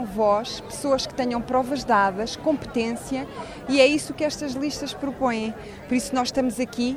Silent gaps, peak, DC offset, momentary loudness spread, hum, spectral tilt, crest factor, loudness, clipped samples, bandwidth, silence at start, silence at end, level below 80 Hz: none; -6 dBFS; under 0.1%; 11 LU; none; -4 dB/octave; 18 dB; -24 LUFS; under 0.1%; 15.5 kHz; 0 s; 0 s; -50 dBFS